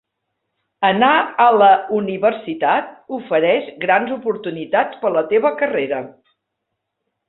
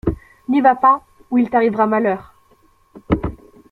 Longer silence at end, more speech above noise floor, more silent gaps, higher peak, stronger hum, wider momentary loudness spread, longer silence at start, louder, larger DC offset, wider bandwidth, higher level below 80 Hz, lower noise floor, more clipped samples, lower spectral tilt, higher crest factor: first, 1.2 s vs 0.35 s; first, 60 dB vs 39 dB; neither; about the same, -2 dBFS vs -2 dBFS; neither; about the same, 11 LU vs 12 LU; first, 0.8 s vs 0.05 s; about the same, -17 LUFS vs -17 LUFS; neither; second, 4.1 kHz vs 4.6 kHz; second, -64 dBFS vs -38 dBFS; first, -77 dBFS vs -55 dBFS; neither; about the same, -9.5 dB/octave vs -9 dB/octave; about the same, 16 dB vs 16 dB